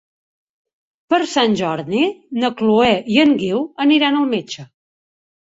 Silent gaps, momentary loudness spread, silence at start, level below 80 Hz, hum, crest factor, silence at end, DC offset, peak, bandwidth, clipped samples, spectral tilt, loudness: none; 7 LU; 1.1 s; -56 dBFS; none; 16 dB; 0.75 s; under 0.1%; -2 dBFS; 8 kHz; under 0.1%; -5 dB/octave; -17 LUFS